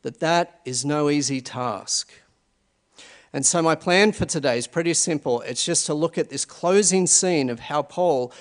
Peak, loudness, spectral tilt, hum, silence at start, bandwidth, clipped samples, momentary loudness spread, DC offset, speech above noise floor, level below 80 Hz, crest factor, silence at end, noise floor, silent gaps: -2 dBFS; -21 LUFS; -3 dB/octave; none; 0.05 s; 11 kHz; under 0.1%; 9 LU; under 0.1%; 46 dB; -58 dBFS; 20 dB; 0.1 s; -68 dBFS; none